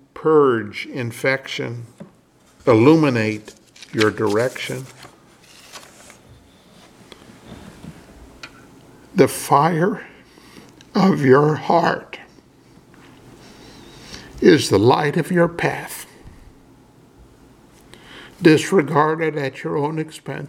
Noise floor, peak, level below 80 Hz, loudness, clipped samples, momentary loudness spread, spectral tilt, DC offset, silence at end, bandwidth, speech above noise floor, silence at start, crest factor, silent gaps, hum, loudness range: -53 dBFS; 0 dBFS; -54 dBFS; -18 LUFS; under 0.1%; 26 LU; -6 dB/octave; under 0.1%; 0 s; 16.5 kHz; 36 dB; 0.15 s; 20 dB; none; none; 7 LU